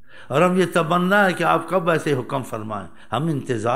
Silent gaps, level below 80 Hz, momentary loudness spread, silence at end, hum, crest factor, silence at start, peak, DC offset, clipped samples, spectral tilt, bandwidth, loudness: none; -62 dBFS; 12 LU; 0 s; none; 16 dB; 0.15 s; -4 dBFS; 0.9%; under 0.1%; -6 dB/octave; 16 kHz; -20 LUFS